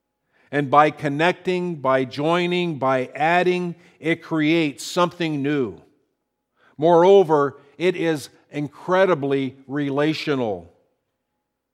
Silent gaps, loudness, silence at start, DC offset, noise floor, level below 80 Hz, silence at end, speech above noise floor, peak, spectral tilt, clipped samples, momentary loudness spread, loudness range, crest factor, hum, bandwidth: none; -21 LUFS; 0.5 s; under 0.1%; -78 dBFS; -70 dBFS; 1.1 s; 57 dB; -2 dBFS; -6 dB/octave; under 0.1%; 11 LU; 4 LU; 20 dB; none; 15 kHz